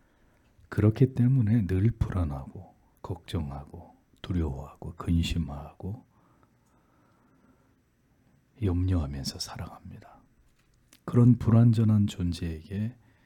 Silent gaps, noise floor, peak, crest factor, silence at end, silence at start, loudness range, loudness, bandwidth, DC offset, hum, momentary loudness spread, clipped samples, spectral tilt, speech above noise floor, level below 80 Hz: none; -67 dBFS; -10 dBFS; 18 dB; 0.3 s; 0.7 s; 10 LU; -27 LUFS; 12.5 kHz; under 0.1%; none; 22 LU; under 0.1%; -8 dB/octave; 40 dB; -46 dBFS